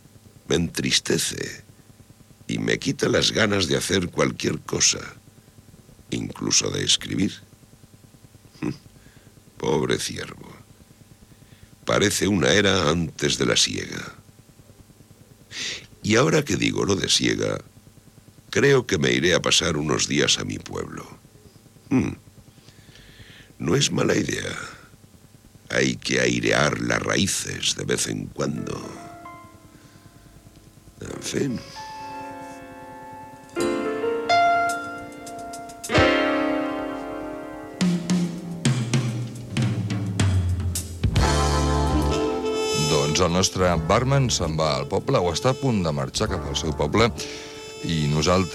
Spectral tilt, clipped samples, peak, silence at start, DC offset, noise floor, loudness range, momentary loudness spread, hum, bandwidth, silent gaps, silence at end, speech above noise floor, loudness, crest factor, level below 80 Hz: -4 dB/octave; under 0.1%; -4 dBFS; 0.5 s; under 0.1%; -51 dBFS; 9 LU; 16 LU; none; 15.5 kHz; none; 0 s; 28 dB; -22 LUFS; 20 dB; -40 dBFS